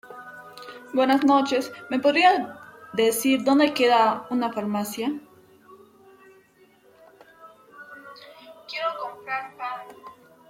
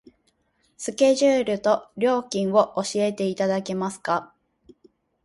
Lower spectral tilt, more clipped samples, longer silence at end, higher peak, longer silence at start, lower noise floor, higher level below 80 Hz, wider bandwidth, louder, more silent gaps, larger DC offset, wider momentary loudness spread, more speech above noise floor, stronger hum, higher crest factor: about the same, -3.5 dB/octave vs -4.5 dB/octave; neither; second, 0.4 s vs 1 s; about the same, -6 dBFS vs -6 dBFS; second, 0.05 s vs 0.8 s; second, -57 dBFS vs -68 dBFS; second, -72 dBFS vs -66 dBFS; first, 16.5 kHz vs 11.5 kHz; about the same, -23 LUFS vs -23 LUFS; neither; neither; first, 24 LU vs 8 LU; second, 36 dB vs 46 dB; neither; about the same, 18 dB vs 18 dB